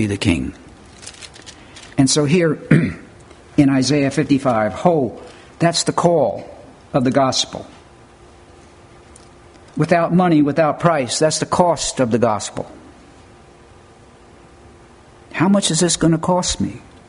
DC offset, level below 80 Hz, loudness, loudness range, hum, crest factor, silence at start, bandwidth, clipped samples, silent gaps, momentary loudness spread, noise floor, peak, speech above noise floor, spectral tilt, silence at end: under 0.1%; -46 dBFS; -17 LUFS; 6 LU; none; 18 dB; 0 s; 11 kHz; under 0.1%; none; 19 LU; -45 dBFS; 0 dBFS; 29 dB; -5 dB/octave; 0.3 s